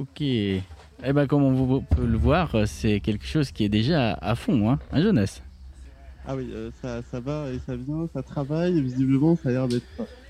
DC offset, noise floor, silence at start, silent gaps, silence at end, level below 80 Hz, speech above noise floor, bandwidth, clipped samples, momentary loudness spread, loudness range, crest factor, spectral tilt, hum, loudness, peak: under 0.1%; -44 dBFS; 0 s; none; 0 s; -38 dBFS; 20 dB; 13 kHz; under 0.1%; 12 LU; 7 LU; 16 dB; -7.5 dB/octave; none; -25 LUFS; -10 dBFS